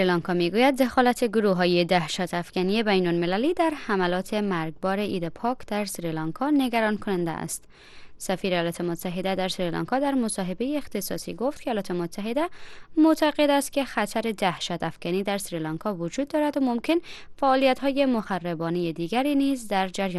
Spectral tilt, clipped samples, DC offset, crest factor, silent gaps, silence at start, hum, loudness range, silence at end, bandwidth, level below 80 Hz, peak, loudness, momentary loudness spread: -5 dB/octave; under 0.1%; under 0.1%; 18 dB; none; 0 s; none; 4 LU; 0 s; 12.5 kHz; -54 dBFS; -6 dBFS; -25 LUFS; 9 LU